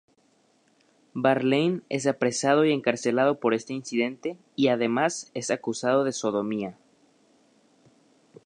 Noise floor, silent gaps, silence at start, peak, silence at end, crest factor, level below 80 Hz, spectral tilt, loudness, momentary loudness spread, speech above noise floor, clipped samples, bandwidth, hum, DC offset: -65 dBFS; none; 1.15 s; -6 dBFS; 1.75 s; 20 dB; -76 dBFS; -4.5 dB/octave; -25 LUFS; 9 LU; 40 dB; under 0.1%; 11 kHz; none; under 0.1%